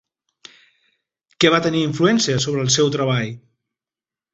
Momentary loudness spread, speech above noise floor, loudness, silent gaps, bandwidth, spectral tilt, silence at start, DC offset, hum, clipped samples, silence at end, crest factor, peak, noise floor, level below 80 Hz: 7 LU; over 72 dB; -18 LUFS; none; 8.4 kHz; -4 dB/octave; 1.4 s; under 0.1%; none; under 0.1%; 0.95 s; 20 dB; -2 dBFS; under -90 dBFS; -56 dBFS